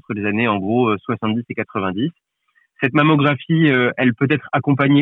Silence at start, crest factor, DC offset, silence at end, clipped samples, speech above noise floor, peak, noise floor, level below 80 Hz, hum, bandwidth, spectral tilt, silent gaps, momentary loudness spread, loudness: 0.1 s; 14 dB; under 0.1%; 0 s; under 0.1%; 36 dB; -4 dBFS; -53 dBFS; -62 dBFS; none; 4.1 kHz; -9.5 dB/octave; none; 8 LU; -18 LUFS